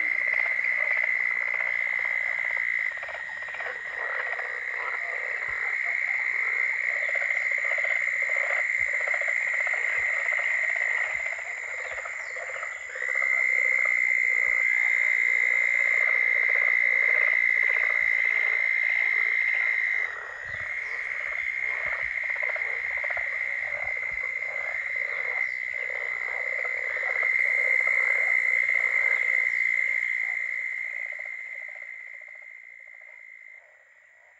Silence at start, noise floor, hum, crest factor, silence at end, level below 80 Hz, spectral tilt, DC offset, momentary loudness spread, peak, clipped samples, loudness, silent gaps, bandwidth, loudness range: 0 s; -56 dBFS; none; 16 dB; 0.8 s; -68 dBFS; -0.5 dB/octave; under 0.1%; 11 LU; -12 dBFS; under 0.1%; -24 LUFS; none; 8.8 kHz; 7 LU